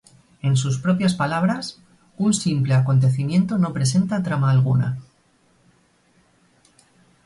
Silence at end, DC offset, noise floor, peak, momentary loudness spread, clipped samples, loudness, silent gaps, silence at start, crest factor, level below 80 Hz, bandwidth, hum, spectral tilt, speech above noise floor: 2.25 s; under 0.1%; -60 dBFS; -8 dBFS; 7 LU; under 0.1%; -20 LUFS; none; 0.45 s; 14 dB; -56 dBFS; 11.5 kHz; none; -6 dB/octave; 41 dB